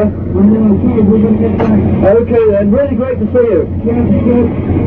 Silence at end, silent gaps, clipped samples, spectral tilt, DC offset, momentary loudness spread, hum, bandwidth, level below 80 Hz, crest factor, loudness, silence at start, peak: 0 s; none; under 0.1%; -12 dB/octave; under 0.1%; 4 LU; none; 3.6 kHz; -28 dBFS; 10 dB; -10 LUFS; 0 s; 0 dBFS